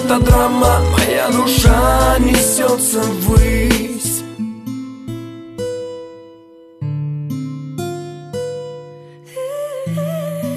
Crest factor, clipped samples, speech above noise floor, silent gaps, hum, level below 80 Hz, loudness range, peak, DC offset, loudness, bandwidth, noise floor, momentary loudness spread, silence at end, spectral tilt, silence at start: 16 dB; under 0.1%; 30 dB; none; none; -22 dBFS; 13 LU; 0 dBFS; under 0.1%; -16 LUFS; 14 kHz; -42 dBFS; 17 LU; 0 s; -4.5 dB/octave; 0 s